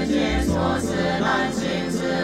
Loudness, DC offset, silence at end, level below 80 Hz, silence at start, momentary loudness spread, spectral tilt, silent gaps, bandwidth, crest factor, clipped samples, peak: -22 LUFS; under 0.1%; 0 s; -34 dBFS; 0 s; 3 LU; -5 dB/octave; none; 15 kHz; 12 dB; under 0.1%; -8 dBFS